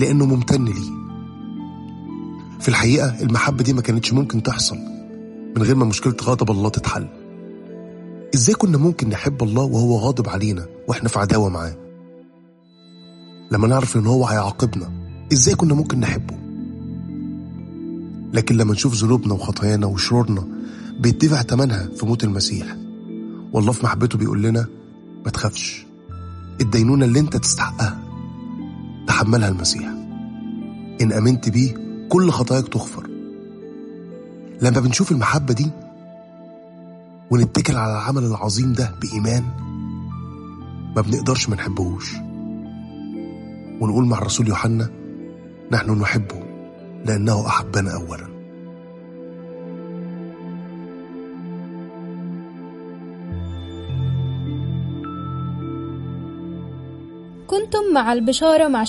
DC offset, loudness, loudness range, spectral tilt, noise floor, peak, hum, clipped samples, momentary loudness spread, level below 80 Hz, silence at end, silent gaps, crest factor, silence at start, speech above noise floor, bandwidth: under 0.1%; -20 LUFS; 8 LU; -5.5 dB/octave; -50 dBFS; 0 dBFS; none; under 0.1%; 19 LU; -44 dBFS; 0 s; none; 20 dB; 0 s; 32 dB; 11.5 kHz